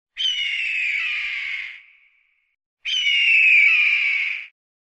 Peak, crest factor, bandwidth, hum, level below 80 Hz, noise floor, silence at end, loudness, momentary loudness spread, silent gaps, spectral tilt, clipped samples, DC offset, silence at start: -6 dBFS; 14 dB; 8.8 kHz; none; -66 dBFS; -63 dBFS; 0.35 s; -17 LUFS; 17 LU; 2.66-2.77 s; 4.5 dB/octave; under 0.1%; under 0.1%; 0.15 s